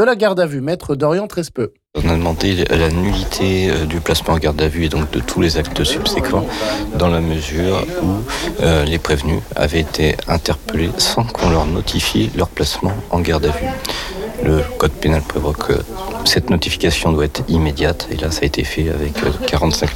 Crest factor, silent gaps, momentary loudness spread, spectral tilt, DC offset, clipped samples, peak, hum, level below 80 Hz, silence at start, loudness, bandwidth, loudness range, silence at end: 12 dB; none; 5 LU; -5 dB/octave; under 0.1%; under 0.1%; -4 dBFS; none; -28 dBFS; 0 s; -17 LUFS; 17 kHz; 1 LU; 0 s